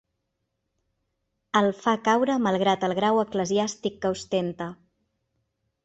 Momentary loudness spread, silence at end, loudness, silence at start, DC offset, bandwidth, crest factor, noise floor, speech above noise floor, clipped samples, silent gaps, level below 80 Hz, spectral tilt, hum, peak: 7 LU; 1.1 s; -25 LUFS; 1.55 s; under 0.1%; 8.2 kHz; 20 dB; -79 dBFS; 55 dB; under 0.1%; none; -64 dBFS; -5 dB/octave; none; -6 dBFS